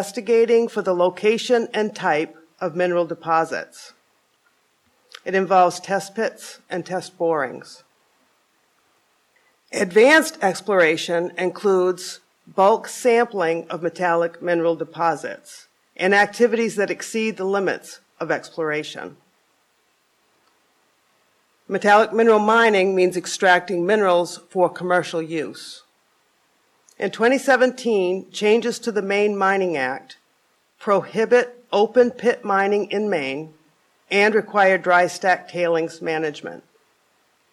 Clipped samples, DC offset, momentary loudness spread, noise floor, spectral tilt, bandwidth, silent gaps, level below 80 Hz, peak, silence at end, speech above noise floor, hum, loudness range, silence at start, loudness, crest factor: under 0.1%; under 0.1%; 14 LU; -65 dBFS; -4.5 dB/octave; 13.5 kHz; none; -76 dBFS; -4 dBFS; 0.95 s; 45 dB; none; 8 LU; 0 s; -20 LUFS; 16 dB